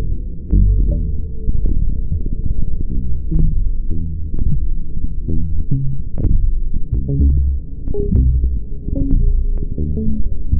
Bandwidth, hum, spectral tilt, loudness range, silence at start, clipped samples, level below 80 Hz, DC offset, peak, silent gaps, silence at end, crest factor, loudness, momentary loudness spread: 0.9 kHz; none; -17 dB/octave; 4 LU; 0 s; under 0.1%; -16 dBFS; under 0.1%; -2 dBFS; none; 0 s; 12 dB; -21 LUFS; 9 LU